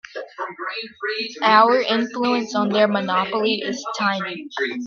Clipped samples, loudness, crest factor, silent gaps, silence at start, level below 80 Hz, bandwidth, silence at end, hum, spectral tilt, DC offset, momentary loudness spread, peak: under 0.1%; -20 LUFS; 20 dB; none; 0.15 s; -70 dBFS; 7.2 kHz; 0 s; none; -4.5 dB/octave; under 0.1%; 14 LU; 0 dBFS